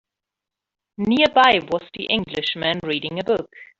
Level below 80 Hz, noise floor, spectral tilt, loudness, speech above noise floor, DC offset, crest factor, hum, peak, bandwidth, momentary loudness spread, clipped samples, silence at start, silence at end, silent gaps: -56 dBFS; -86 dBFS; -5.5 dB/octave; -20 LUFS; 65 dB; under 0.1%; 18 dB; none; -4 dBFS; 7.8 kHz; 11 LU; under 0.1%; 1 s; 0.15 s; none